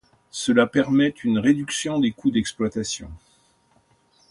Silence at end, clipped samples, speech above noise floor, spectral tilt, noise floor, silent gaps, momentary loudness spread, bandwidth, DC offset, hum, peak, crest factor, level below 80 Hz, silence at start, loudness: 1.15 s; under 0.1%; 40 dB; -4.5 dB/octave; -62 dBFS; none; 10 LU; 11.5 kHz; under 0.1%; none; -4 dBFS; 18 dB; -52 dBFS; 0.35 s; -22 LUFS